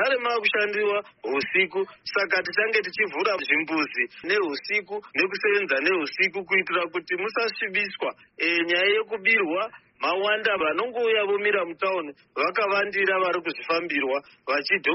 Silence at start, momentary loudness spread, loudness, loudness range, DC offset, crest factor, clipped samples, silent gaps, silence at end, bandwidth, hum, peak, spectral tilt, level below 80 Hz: 0 s; 7 LU; -24 LUFS; 1 LU; under 0.1%; 18 dB; under 0.1%; none; 0 s; 6 kHz; none; -6 dBFS; 0 dB/octave; -74 dBFS